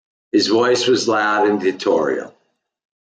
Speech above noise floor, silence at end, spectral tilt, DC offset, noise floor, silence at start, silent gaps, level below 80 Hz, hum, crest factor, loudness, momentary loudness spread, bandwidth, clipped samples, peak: 50 dB; 0.8 s; -3.5 dB/octave; under 0.1%; -67 dBFS; 0.35 s; none; -68 dBFS; none; 14 dB; -17 LUFS; 7 LU; 9.4 kHz; under 0.1%; -4 dBFS